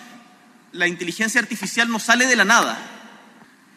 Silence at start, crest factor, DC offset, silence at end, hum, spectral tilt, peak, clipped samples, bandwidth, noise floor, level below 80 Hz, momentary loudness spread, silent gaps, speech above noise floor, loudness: 0 s; 22 dB; under 0.1%; 0.7 s; none; -2 dB/octave; 0 dBFS; under 0.1%; 15.5 kHz; -51 dBFS; -76 dBFS; 15 LU; none; 31 dB; -18 LUFS